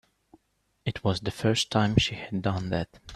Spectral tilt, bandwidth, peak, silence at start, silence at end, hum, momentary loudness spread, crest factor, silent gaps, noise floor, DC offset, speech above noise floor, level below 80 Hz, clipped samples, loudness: -5 dB/octave; 13 kHz; -6 dBFS; 0.85 s; 0 s; none; 8 LU; 22 dB; none; -73 dBFS; under 0.1%; 46 dB; -50 dBFS; under 0.1%; -28 LUFS